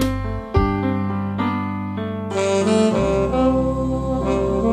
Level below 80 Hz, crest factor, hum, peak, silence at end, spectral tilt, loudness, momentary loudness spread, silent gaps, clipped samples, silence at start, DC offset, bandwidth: -32 dBFS; 16 dB; none; -4 dBFS; 0 s; -7 dB/octave; -20 LUFS; 8 LU; none; under 0.1%; 0 s; under 0.1%; 14 kHz